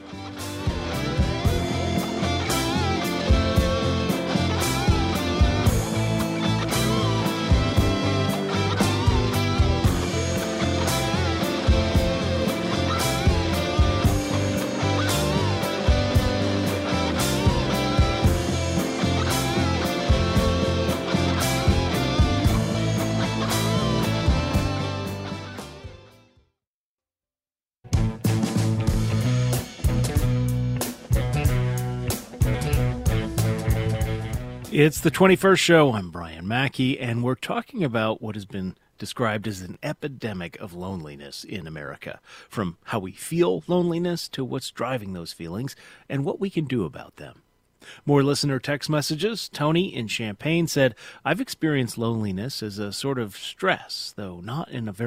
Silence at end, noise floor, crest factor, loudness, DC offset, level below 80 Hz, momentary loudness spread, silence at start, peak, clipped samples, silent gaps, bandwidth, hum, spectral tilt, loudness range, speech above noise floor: 0 s; under -90 dBFS; 20 dB; -24 LUFS; under 0.1%; -32 dBFS; 12 LU; 0 s; -2 dBFS; under 0.1%; 26.67-26.98 s; 16 kHz; none; -5.5 dB/octave; 8 LU; over 65 dB